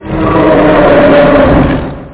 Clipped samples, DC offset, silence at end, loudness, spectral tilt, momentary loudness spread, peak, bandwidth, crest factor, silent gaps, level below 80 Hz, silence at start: under 0.1%; under 0.1%; 0 s; -6 LUFS; -11 dB/octave; 7 LU; 0 dBFS; 4 kHz; 6 dB; none; -22 dBFS; 0 s